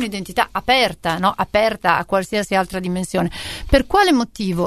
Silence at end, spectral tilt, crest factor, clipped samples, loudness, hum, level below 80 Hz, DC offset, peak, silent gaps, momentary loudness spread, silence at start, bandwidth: 0 s; -4.5 dB/octave; 18 dB; under 0.1%; -18 LUFS; none; -34 dBFS; 0.2%; 0 dBFS; none; 8 LU; 0 s; 13.5 kHz